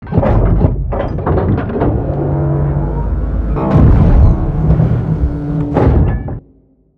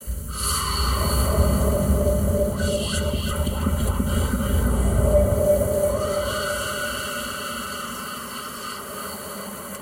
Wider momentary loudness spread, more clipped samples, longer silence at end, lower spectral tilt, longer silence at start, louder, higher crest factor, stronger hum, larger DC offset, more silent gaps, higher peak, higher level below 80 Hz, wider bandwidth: second, 8 LU vs 11 LU; first, 0.1% vs under 0.1%; first, 0.6 s vs 0 s; first, -11.5 dB/octave vs -5 dB/octave; about the same, 0 s vs 0 s; first, -14 LUFS vs -24 LUFS; about the same, 12 dB vs 16 dB; neither; neither; neither; first, 0 dBFS vs -6 dBFS; first, -16 dBFS vs -28 dBFS; second, 4.5 kHz vs 16.5 kHz